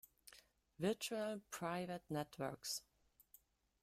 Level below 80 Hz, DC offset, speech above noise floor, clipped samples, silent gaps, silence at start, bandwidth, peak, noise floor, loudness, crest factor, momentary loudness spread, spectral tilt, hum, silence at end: -78 dBFS; under 0.1%; 27 dB; under 0.1%; none; 0.25 s; 16 kHz; -26 dBFS; -72 dBFS; -45 LUFS; 20 dB; 20 LU; -4 dB/octave; none; 1 s